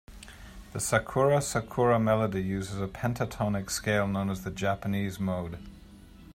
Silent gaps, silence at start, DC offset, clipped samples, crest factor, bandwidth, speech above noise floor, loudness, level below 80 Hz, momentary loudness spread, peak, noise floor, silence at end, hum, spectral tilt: none; 0.1 s; under 0.1%; under 0.1%; 20 dB; 16 kHz; 22 dB; -29 LUFS; -50 dBFS; 17 LU; -10 dBFS; -50 dBFS; 0.05 s; none; -5.5 dB/octave